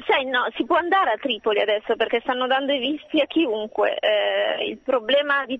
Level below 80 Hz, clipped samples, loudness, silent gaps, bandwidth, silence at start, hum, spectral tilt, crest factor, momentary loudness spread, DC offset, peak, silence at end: -64 dBFS; under 0.1%; -22 LUFS; none; 7.8 kHz; 0 s; none; -5 dB/octave; 14 dB; 4 LU; under 0.1%; -8 dBFS; 0 s